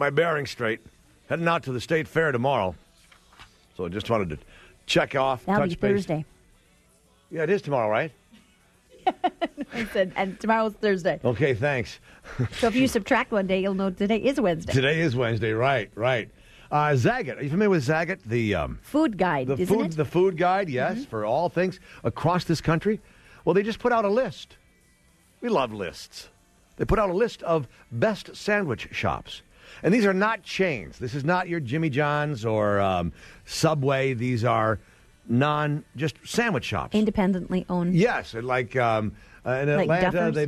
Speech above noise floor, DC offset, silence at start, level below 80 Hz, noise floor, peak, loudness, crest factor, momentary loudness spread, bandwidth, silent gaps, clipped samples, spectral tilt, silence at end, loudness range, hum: 36 dB; under 0.1%; 0 s; -50 dBFS; -60 dBFS; -6 dBFS; -25 LUFS; 18 dB; 10 LU; 13.5 kHz; none; under 0.1%; -6 dB/octave; 0 s; 4 LU; none